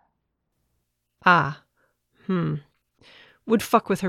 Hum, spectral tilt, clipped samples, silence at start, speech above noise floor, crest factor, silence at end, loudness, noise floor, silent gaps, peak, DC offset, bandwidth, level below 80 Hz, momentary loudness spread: 60 Hz at -50 dBFS; -6 dB/octave; under 0.1%; 1.25 s; 55 dB; 22 dB; 0 s; -23 LUFS; -76 dBFS; none; -4 dBFS; under 0.1%; 16.5 kHz; -64 dBFS; 21 LU